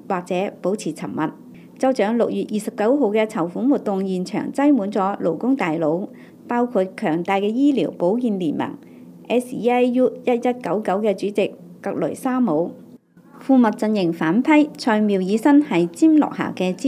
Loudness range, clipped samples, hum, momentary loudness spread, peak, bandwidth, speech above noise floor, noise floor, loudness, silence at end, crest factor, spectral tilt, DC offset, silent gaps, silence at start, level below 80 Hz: 4 LU; under 0.1%; none; 10 LU; -6 dBFS; 14 kHz; 27 dB; -47 dBFS; -20 LUFS; 0 s; 14 dB; -6.5 dB/octave; under 0.1%; none; 0.1 s; -74 dBFS